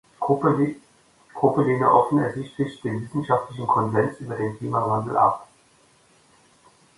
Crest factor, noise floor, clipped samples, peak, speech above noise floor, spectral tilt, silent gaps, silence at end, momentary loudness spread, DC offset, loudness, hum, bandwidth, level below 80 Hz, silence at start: 20 dB; -58 dBFS; under 0.1%; -4 dBFS; 36 dB; -8.5 dB/octave; none; 1.55 s; 11 LU; under 0.1%; -23 LUFS; none; 11.5 kHz; -60 dBFS; 0.2 s